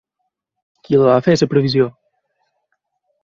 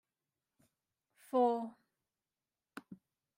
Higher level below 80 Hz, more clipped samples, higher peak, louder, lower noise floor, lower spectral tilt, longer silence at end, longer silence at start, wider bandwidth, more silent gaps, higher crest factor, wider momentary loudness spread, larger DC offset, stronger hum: first, -56 dBFS vs under -90 dBFS; neither; first, -2 dBFS vs -20 dBFS; first, -15 LUFS vs -34 LUFS; second, -75 dBFS vs under -90 dBFS; about the same, -6.5 dB/octave vs -6.5 dB/octave; first, 1.35 s vs 0.4 s; second, 0.9 s vs 1.35 s; second, 7.4 kHz vs 16 kHz; neither; about the same, 18 dB vs 20 dB; second, 5 LU vs 23 LU; neither; neither